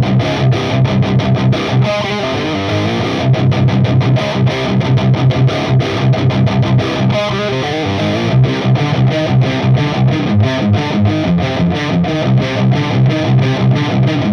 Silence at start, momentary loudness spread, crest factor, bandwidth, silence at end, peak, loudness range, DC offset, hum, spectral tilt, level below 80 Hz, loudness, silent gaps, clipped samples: 0 s; 3 LU; 10 dB; 6.8 kHz; 0 s; -2 dBFS; 1 LU; under 0.1%; none; -7.5 dB/octave; -36 dBFS; -13 LUFS; none; under 0.1%